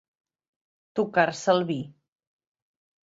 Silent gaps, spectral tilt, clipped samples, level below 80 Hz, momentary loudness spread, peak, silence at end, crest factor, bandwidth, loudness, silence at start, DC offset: none; -5 dB/octave; under 0.1%; -72 dBFS; 11 LU; -6 dBFS; 1.15 s; 24 dB; 8 kHz; -25 LUFS; 0.95 s; under 0.1%